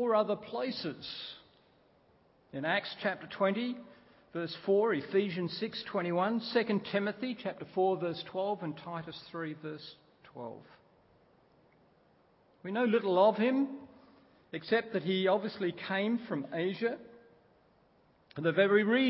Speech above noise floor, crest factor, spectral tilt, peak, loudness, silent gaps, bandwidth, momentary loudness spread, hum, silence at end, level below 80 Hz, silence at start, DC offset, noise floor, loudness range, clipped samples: 35 dB; 20 dB; -4 dB/octave; -14 dBFS; -33 LUFS; none; 5.6 kHz; 17 LU; none; 0 s; -78 dBFS; 0 s; under 0.1%; -67 dBFS; 10 LU; under 0.1%